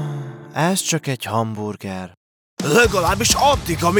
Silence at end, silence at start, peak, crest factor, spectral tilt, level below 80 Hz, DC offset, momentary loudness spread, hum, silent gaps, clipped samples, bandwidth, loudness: 0 s; 0 s; -2 dBFS; 18 dB; -3.5 dB/octave; -38 dBFS; under 0.1%; 16 LU; none; 2.17-2.57 s; under 0.1%; over 20 kHz; -18 LUFS